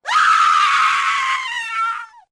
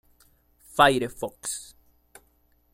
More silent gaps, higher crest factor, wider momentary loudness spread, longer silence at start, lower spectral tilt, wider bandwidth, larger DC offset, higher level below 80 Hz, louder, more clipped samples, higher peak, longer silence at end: neither; second, 12 dB vs 26 dB; second, 10 LU vs 14 LU; second, 0.05 s vs 0.75 s; second, 2.5 dB/octave vs -3 dB/octave; second, 13 kHz vs 16 kHz; neither; second, -66 dBFS vs -56 dBFS; first, -15 LUFS vs -25 LUFS; neither; second, -6 dBFS vs -2 dBFS; second, 0.25 s vs 1.1 s